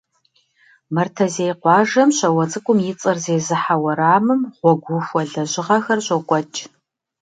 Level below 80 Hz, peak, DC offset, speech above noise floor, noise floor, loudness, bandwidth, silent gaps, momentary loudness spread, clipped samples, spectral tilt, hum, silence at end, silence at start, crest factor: -68 dBFS; 0 dBFS; under 0.1%; 45 dB; -63 dBFS; -18 LUFS; 9.4 kHz; none; 7 LU; under 0.1%; -5 dB/octave; none; 0.55 s; 0.9 s; 18 dB